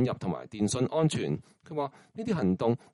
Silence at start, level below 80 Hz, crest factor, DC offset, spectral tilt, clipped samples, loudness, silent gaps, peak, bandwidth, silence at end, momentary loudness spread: 0 s; -62 dBFS; 16 dB; under 0.1%; -6.5 dB/octave; under 0.1%; -31 LUFS; none; -14 dBFS; 11.5 kHz; 0.15 s; 10 LU